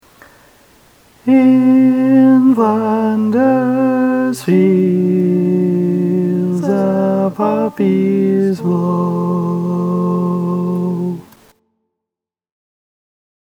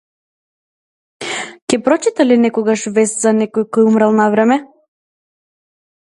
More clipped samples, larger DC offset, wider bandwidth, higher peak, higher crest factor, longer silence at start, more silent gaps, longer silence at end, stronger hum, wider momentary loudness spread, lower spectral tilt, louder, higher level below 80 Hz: neither; neither; about the same, 12 kHz vs 11.5 kHz; about the same, 0 dBFS vs 0 dBFS; about the same, 14 dB vs 16 dB; about the same, 1.25 s vs 1.2 s; second, none vs 1.62-1.67 s; first, 2.2 s vs 1.35 s; neither; second, 8 LU vs 11 LU; first, -9 dB/octave vs -4.5 dB/octave; about the same, -14 LUFS vs -14 LUFS; about the same, -60 dBFS vs -64 dBFS